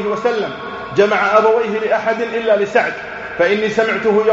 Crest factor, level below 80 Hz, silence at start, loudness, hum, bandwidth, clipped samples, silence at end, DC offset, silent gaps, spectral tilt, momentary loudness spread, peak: 16 dB; -54 dBFS; 0 s; -16 LUFS; none; 7.8 kHz; under 0.1%; 0 s; under 0.1%; none; -2.5 dB/octave; 9 LU; 0 dBFS